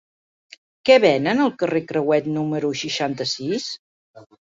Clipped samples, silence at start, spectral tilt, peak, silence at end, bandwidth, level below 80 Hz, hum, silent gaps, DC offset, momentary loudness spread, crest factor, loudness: under 0.1%; 0.85 s; -5 dB/octave; -2 dBFS; 0.35 s; 7.8 kHz; -64 dBFS; none; 3.79-4.14 s; under 0.1%; 11 LU; 20 dB; -20 LUFS